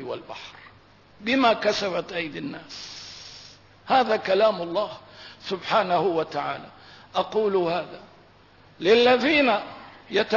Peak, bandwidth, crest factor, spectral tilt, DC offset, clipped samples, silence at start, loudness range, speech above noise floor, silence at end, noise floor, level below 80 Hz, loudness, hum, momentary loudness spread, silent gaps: -8 dBFS; 6 kHz; 18 dB; -4.5 dB/octave; under 0.1%; under 0.1%; 0 s; 4 LU; 30 dB; 0 s; -54 dBFS; -64 dBFS; -23 LUFS; none; 21 LU; none